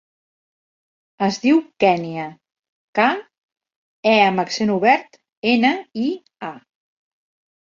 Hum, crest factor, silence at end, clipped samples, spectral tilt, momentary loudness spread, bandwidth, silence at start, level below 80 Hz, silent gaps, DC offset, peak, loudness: none; 20 dB; 1.05 s; under 0.1%; -5 dB/octave; 15 LU; 7.6 kHz; 1.2 s; -66 dBFS; 2.69-2.93 s, 3.38-3.49 s, 3.76-4.03 s, 5.37-5.42 s; under 0.1%; -2 dBFS; -19 LUFS